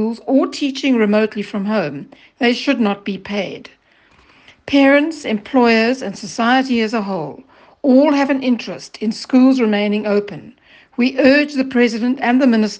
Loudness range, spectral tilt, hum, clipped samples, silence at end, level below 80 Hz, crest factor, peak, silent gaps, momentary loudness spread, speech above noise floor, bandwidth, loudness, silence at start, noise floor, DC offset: 3 LU; -5.5 dB/octave; none; under 0.1%; 0 s; -60 dBFS; 16 dB; 0 dBFS; none; 13 LU; 36 dB; 8.8 kHz; -16 LUFS; 0 s; -52 dBFS; under 0.1%